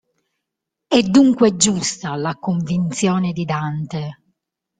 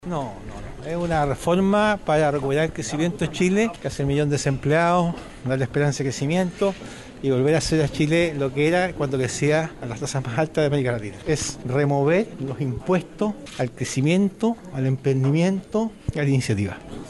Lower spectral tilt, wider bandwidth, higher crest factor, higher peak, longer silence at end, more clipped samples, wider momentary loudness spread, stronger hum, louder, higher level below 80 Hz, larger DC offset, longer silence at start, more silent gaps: about the same, -5 dB/octave vs -6 dB/octave; second, 9.6 kHz vs 12 kHz; about the same, 18 dB vs 14 dB; first, 0 dBFS vs -8 dBFS; first, 0.65 s vs 0 s; neither; first, 12 LU vs 9 LU; neither; first, -18 LUFS vs -23 LUFS; second, -56 dBFS vs -44 dBFS; neither; first, 0.9 s vs 0.05 s; neither